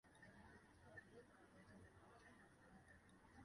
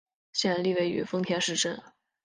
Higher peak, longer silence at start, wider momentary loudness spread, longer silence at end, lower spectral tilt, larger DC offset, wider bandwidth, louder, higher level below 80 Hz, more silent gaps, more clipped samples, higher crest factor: second, -48 dBFS vs -12 dBFS; second, 0.05 s vs 0.35 s; about the same, 5 LU vs 5 LU; second, 0 s vs 0.35 s; first, -5.5 dB/octave vs -3.5 dB/octave; neither; about the same, 11 kHz vs 10 kHz; second, -67 LUFS vs -28 LUFS; second, -78 dBFS vs -70 dBFS; neither; neither; about the same, 18 dB vs 18 dB